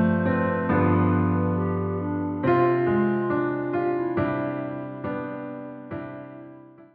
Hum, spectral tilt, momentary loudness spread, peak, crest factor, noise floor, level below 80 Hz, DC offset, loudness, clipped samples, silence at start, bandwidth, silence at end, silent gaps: none; -12 dB/octave; 15 LU; -10 dBFS; 16 dB; -46 dBFS; -58 dBFS; under 0.1%; -24 LUFS; under 0.1%; 0 s; 4.6 kHz; 0.1 s; none